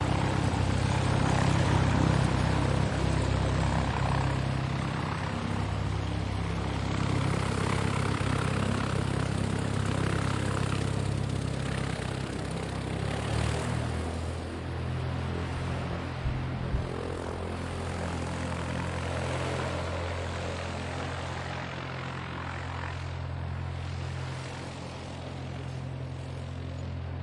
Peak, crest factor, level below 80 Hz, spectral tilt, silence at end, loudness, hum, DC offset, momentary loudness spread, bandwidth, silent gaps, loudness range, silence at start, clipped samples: -12 dBFS; 18 dB; -40 dBFS; -6 dB/octave; 0 s; -31 LUFS; none; under 0.1%; 9 LU; 11.5 kHz; none; 9 LU; 0 s; under 0.1%